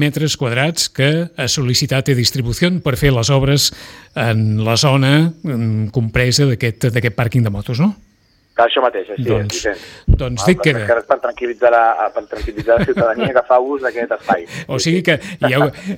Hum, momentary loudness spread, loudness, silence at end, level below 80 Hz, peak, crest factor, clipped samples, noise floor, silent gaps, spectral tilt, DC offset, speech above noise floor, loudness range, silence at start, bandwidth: none; 7 LU; -16 LUFS; 0 s; -32 dBFS; 0 dBFS; 14 dB; under 0.1%; -55 dBFS; none; -5 dB/octave; under 0.1%; 40 dB; 2 LU; 0 s; 16.5 kHz